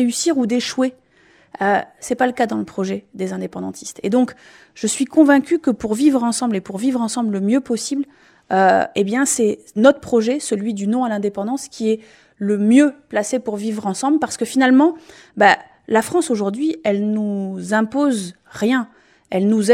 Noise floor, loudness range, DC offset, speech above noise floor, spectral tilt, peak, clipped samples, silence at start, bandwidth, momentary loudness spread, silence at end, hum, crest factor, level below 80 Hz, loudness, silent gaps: -53 dBFS; 4 LU; under 0.1%; 36 dB; -4.5 dB/octave; 0 dBFS; under 0.1%; 0 s; 15 kHz; 11 LU; 0 s; none; 18 dB; -60 dBFS; -18 LUFS; none